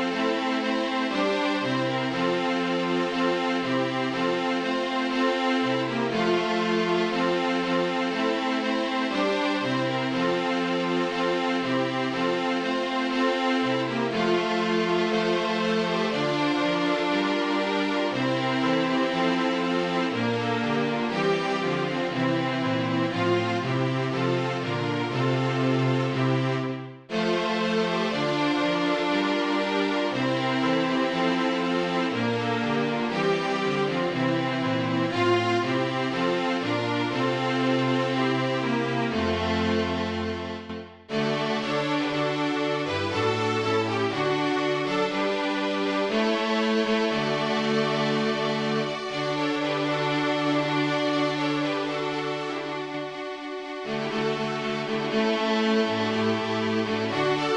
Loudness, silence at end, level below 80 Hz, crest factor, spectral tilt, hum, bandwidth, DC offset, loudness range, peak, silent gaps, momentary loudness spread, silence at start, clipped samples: -25 LUFS; 0 s; -60 dBFS; 14 dB; -5.5 dB/octave; none; 10.5 kHz; under 0.1%; 2 LU; -12 dBFS; none; 3 LU; 0 s; under 0.1%